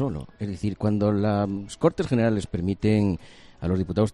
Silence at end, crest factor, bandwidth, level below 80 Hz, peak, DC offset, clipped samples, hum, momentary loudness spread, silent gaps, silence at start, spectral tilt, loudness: 0 s; 18 dB; 11 kHz; -46 dBFS; -6 dBFS; under 0.1%; under 0.1%; none; 9 LU; none; 0 s; -8 dB/octave; -25 LUFS